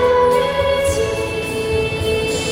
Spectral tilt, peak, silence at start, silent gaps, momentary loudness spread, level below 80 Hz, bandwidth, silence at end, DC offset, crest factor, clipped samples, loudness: -4 dB/octave; -4 dBFS; 0 s; none; 7 LU; -34 dBFS; 16.5 kHz; 0 s; under 0.1%; 12 dB; under 0.1%; -18 LUFS